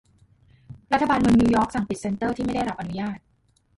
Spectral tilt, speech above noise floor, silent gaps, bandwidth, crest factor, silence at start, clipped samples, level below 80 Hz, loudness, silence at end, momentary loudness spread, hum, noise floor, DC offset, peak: -6.5 dB/octave; 42 dB; none; 11.5 kHz; 16 dB; 0.7 s; under 0.1%; -44 dBFS; -23 LUFS; 0.6 s; 12 LU; none; -64 dBFS; under 0.1%; -8 dBFS